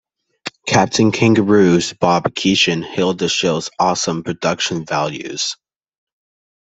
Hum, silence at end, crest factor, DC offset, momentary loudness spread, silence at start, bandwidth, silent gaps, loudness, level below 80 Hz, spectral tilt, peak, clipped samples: none; 1.25 s; 18 dB; under 0.1%; 10 LU; 0.45 s; 8.4 kHz; none; -16 LUFS; -54 dBFS; -4.5 dB/octave; 0 dBFS; under 0.1%